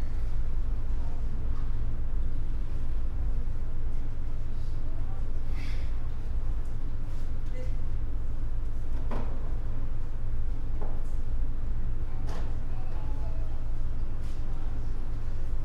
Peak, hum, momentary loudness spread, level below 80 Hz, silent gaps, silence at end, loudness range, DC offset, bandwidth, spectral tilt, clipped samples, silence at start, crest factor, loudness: -16 dBFS; none; 3 LU; -28 dBFS; none; 0 s; 1 LU; under 0.1%; 2.7 kHz; -8 dB/octave; under 0.1%; 0 s; 8 dB; -37 LUFS